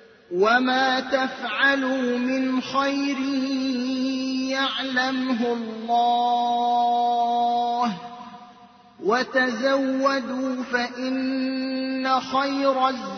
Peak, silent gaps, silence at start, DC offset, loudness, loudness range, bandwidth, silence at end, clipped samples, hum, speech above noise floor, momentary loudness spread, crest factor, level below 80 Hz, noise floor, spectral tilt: -8 dBFS; none; 0.3 s; under 0.1%; -23 LUFS; 2 LU; 6.6 kHz; 0 s; under 0.1%; none; 27 dB; 6 LU; 16 dB; -68 dBFS; -50 dBFS; -4 dB/octave